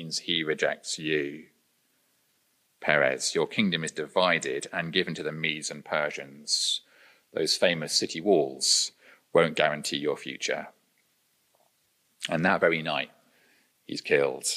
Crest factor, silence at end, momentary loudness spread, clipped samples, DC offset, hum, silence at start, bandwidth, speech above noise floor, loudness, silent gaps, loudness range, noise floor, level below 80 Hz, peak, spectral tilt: 24 dB; 0 s; 10 LU; under 0.1%; under 0.1%; none; 0 s; 15.5 kHz; 43 dB; -27 LUFS; none; 5 LU; -70 dBFS; -74 dBFS; -4 dBFS; -2.5 dB/octave